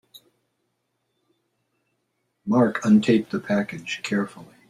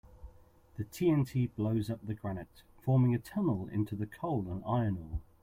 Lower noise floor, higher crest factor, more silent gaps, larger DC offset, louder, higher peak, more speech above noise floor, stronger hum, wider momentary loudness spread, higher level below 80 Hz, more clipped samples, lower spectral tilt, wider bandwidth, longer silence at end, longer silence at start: first, -75 dBFS vs -59 dBFS; about the same, 18 dB vs 16 dB; neither; neither; first, -22 LUFS vs -33 LUFS; first, -6 dBFS vs -18 dBFS; first, 53 dB vs 27 dB; neither; about the same, 12 LU vs 14 LU; second, -66 dBFS vs -52 dBFS; neither; second, -6.5 dB/octave vs -8.5 dB/octave; second, 10.5 kHz vs 16 kHz; about the same, 0.25 s vs 0.2 s; first, 2.45 s vs 0.15 s